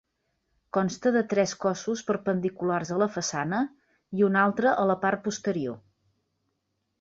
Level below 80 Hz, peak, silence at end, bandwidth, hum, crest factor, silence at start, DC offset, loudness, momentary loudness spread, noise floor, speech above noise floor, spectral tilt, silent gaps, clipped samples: -68 dBFS; -10 dBFS; 1.2 s; 7.8 kHz; none; 18 dB; 0.75 s; under 0.1%; -27 LUFS; 8 LU; -78 dBFS; 52 dB; -5 dB/octave; none; under 0.1%